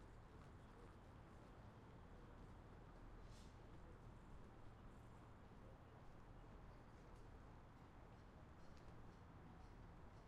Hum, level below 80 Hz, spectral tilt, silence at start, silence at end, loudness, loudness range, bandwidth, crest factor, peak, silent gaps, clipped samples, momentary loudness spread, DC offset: none; -66 dBFS; -6.5 dB/octave; 0 s; 0 s; -64 LUFS; 1 LU; 10.5 kHz; 12 dB; -48 dBFS; none; under 0.1%; 1 LU; under 0.1%